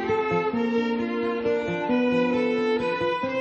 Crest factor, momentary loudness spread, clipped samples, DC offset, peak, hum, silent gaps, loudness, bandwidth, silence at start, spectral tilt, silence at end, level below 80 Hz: 12 dB; 3 LU; under 0.1%; under 0.1%; -12 dBFS; none; none; -24 LUFS; 7.8 kHz; 0 s; -6.5 dB/octave; 0 s; -58 dBFS